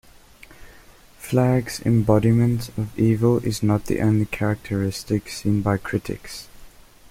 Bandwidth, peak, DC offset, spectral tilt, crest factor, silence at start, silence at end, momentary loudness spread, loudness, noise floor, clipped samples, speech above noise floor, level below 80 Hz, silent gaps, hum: 16 kHz; -4 dBFS; under 0.1%; -7 dB/octave; 18 dB; 0.5 s; 0.4 s; 11 LU; -22 LUFS; -48 dBFS; under 0.1%; 28 dB; -44 dBFS; none; none